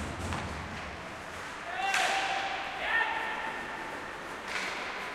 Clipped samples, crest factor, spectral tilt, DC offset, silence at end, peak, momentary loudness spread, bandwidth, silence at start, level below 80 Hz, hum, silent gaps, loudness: under 0.1%; 20 dB; -2.5 dB/octave; under 0.1%; 0 s; -16 dBFS; 11 LU; 16.5 kHz; 0 s; -54 dBFS; none; none; -33 LUFS